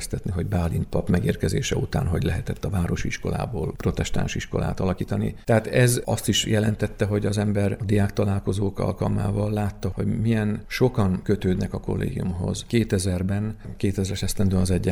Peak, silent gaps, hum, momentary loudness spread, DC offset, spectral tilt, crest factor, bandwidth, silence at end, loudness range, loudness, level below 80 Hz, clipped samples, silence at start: -4 dBFS; none; none; 6 LU; under 0.1%; -6 dB/octave; 18 dB; 15 kHz; 0 s; 3 LU; -25 LUFS; -38 dBFS; under 0.1%; 0 s